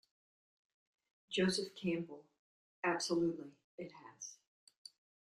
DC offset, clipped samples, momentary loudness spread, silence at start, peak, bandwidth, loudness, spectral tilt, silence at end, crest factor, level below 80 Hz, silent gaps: under 0.1%; under 0.1%; 22 LU; 1.3 s; -22 dBFS; 12.5 kHz; -38 LUFS; -4.5 dB/octave; 1 s; 20 dB; -78 dBFS; 2.39-2.83 s, 3.64-3.78 s